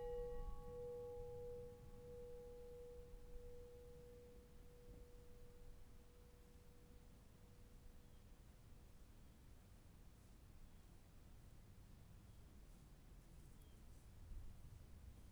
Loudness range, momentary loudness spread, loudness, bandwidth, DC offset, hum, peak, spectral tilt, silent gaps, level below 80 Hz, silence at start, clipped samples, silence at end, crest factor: 10 LU; 13 LU; -61 LUFS; over 20 kHz; under 0.1%; none; -38 dBFS; -6.5 dB/octave; none; -62 dBFS; 0 s; under 0.1%; 0 s; 18 dB